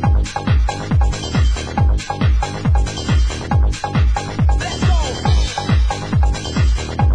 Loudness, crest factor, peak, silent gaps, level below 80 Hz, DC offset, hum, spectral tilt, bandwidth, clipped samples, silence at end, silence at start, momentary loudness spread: -18 LUFS; 10 dB; -4 dBFS; none; -18 dBFS; under 0.1%; none; -5.5 dB/octave; 10 kHz; under 0.1%; 0 s; 0 s; 1 LU